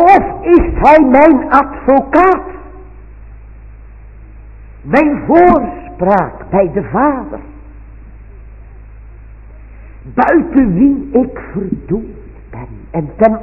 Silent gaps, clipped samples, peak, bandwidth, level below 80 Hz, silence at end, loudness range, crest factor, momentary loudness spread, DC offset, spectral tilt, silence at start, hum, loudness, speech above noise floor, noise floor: none; 0.4%; 0 dBFS; 6.6 kHz; -30 dBFS; 0 s; 9 LU; 12 dB; 21 LU; under 0.1%; -9.5 dB/octave; 0 s; none; -11 LUFS; 23 dB; -34 dBFS